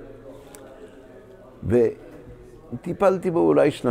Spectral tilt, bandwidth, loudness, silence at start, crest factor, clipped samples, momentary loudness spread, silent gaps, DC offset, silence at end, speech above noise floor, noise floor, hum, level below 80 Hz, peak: -7.5 dB/octave; 15.5 kHz; -21 LUFS; 0 s; 18 dB; under 0.1%; 25 LU; none; under 0.1%; 0 s; 26 dB; -46 dBFS; none; -52 dBFS; -6 dBFS